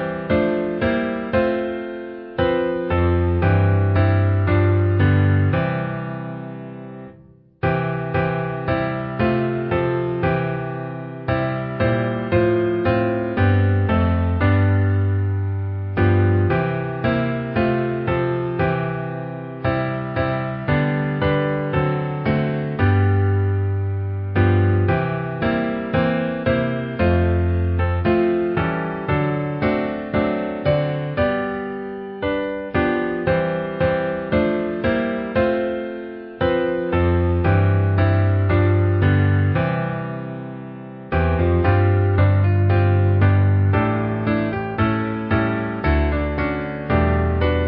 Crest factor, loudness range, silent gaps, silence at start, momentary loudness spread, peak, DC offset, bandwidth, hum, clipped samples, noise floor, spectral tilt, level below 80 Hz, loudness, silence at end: 14 dB; 4 LU; none; 0 s; 8 LU; -4 dBFS; under 0.1%; 4.9 kHz; none; under 0.1%; -48 dBFS; -13 dB/octave; -30 dBFS; -20 LUFS; 0 s